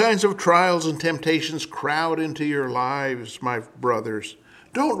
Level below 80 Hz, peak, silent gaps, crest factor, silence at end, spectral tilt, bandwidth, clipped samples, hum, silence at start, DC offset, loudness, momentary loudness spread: -68 dBFS; -4 dBFS; none; 20 dB; 0 s; -4.5 dB/octave; 15 kHz; under 0.1%; none; 0 s; under 0.1%; -23 LUFS; 11 LU